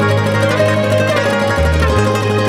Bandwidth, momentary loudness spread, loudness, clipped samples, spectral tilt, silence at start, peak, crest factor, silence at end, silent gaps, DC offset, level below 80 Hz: 15 kHz; 1 LU; -14 LUFS; under 0.1%; -6 dB/octave; 0 s; -2 dBFS; 12 dB; 0 s; none; under 0.1%; -24 dBFS